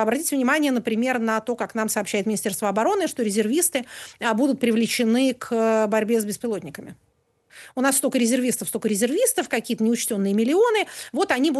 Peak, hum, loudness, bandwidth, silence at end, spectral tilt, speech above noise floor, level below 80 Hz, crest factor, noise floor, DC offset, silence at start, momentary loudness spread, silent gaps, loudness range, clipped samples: -8 dBFS; none; -22 LUFS; 13 kHz; 0 s; -3.5 dB/octave; 32 dB; -70 dBFS; 14 dB; -55 dBFS; under 0.1%; 0 s; 7 LU; none; 2 LU; under 0.1%